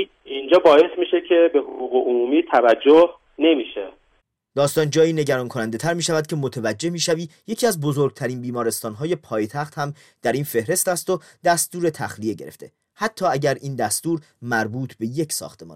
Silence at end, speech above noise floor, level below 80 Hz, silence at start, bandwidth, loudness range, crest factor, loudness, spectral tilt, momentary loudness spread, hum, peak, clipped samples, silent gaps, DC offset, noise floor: 0 s; 45 dB; -64 dBFS; 0 s; 16 kHz; 7 LU; 16 dB; -21 LUFS; -4.5 dB/octave; 12 LU; none; -4 dBFS; under 0.1%; none; under 0.1%; -65 dBFS